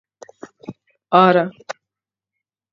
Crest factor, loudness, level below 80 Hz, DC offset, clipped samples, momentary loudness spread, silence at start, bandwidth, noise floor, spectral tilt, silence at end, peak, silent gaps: 20 dB; -15 LUFS; -72 dBFS; under 0.1%; under 0.1%; 25 LU; 0.7 s; 7.6 kHz; -87 dBFS; -6.5 dB/octave; 1 s; 0 dBFS; none